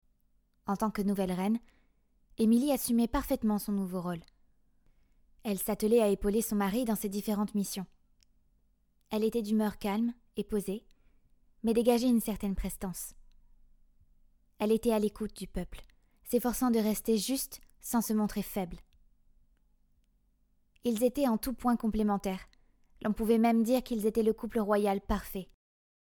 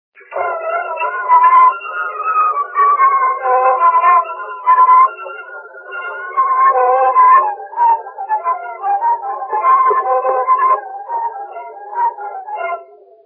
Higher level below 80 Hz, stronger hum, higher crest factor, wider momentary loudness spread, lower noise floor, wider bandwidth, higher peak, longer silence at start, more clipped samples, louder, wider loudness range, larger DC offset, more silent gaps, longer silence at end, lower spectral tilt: first, -50 dBFS vs -82 dBFS; neither; about the same, 18 dB vs 14 dB; second, 13 LU vs 17 LU; first, -70 dBFS vs -37 dBFS; first, 19 kHz vs 3.3 kHz; second, -14 dBFS vs 0 dBFS; first, 0.65 s vs 0.3 s; neither; second, -31 LUFS vs -13 LUFS; about the same, 5 LU vs 4 LU; neither; neither; first, 0.75 s vs 0.4 s; about the same, -5.5 dB/octave vs -4.5 dB/octave